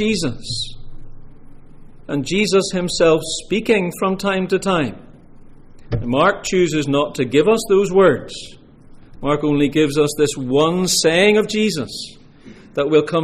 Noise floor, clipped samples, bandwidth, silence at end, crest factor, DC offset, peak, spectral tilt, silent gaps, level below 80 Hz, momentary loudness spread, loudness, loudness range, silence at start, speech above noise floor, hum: -42 dBFS; under 0.1%; 15.5 kHz; 0 s; 16 dB; under 0.1%; -4 dBFS; -4.5 dB/octave; none; -40 dBFS; 12 LU; -17 LUFS; 3 LU; 0 s; 25 dB; none